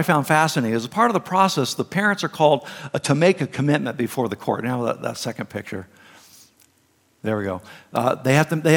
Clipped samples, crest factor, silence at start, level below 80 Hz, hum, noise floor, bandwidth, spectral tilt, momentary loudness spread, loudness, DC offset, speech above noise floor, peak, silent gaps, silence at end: under 0.1%; 20 dB; 0 s; -68 dBFS; none; -62 dBFS; 17.5 kHz; -5.5 dB/octave; 11 LU; -21 LUFS; under 0.1%; 41 dB; -2 dBFS; none; 0 s